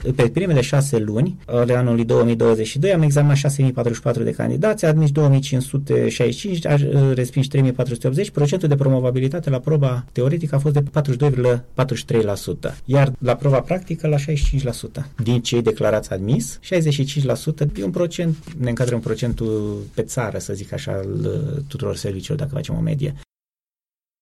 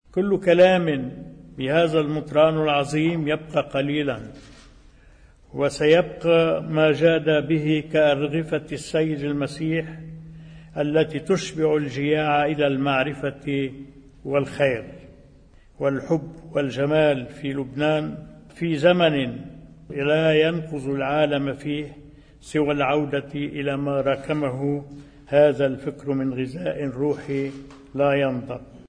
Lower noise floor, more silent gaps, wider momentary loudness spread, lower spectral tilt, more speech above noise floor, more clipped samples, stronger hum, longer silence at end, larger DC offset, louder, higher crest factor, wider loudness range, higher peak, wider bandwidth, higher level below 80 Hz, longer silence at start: first, under -90 dBFS vs -51 dBFS; neither; second, 9 LU vs 13 LU; about the same, -7 dB/octave vs -6.5 dB/octave; first, over 71 dB vs 29 dB; neither; neither; first, 1 s vs 0.05 s; neither; about the same, -20 LUFS vs -22 LUFS; second, 10 dB vs 18 dB; about the same, 7 LU vs 5 LU; about the same, -8 dBFS vs -6 dBFS; first, 12.5 kHz vs 10 kHz; first, -38 dBFS vs -52 dBFS; second, 0 s vs 0.15 s